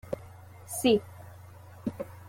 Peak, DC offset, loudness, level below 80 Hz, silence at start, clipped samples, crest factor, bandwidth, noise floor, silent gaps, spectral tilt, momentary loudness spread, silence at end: -12 dBFS; under 0.1%; -30 LUFS; -62 dBFS; 0.05 s; under 0.1%; 20 dB; 16.5 kHz; -49 dBFS; none; -4.5 dB/octave; 24 LU; 0 s